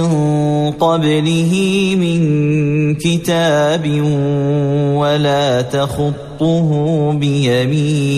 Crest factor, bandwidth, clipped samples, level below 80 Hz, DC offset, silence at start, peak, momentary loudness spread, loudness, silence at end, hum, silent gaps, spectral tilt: 10 dB; 13.5 kHz; under 0.1%; -44 dBFS; under 0.1%; 0 s; -2 dBFS; 2 LU; -14 LUFS; 0 s; none; none; -6.5 dB/octave